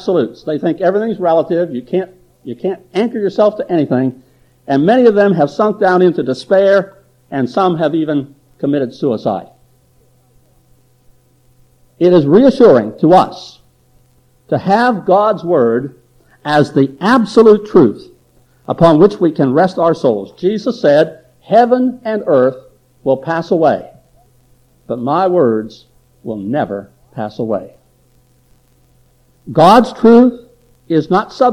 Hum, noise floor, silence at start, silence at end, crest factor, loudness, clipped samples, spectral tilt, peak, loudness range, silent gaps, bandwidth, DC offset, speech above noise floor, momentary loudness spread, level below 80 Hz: none; -52 dBFS; 0 s; 0 s; 14 dB; -13 LUFS; under 0.1%; -7.5 dB/octave; 0 dBFS; 8 LU; none; 11 kHz; under 0.1%; 40 dB; 14 LU; -52 dBFS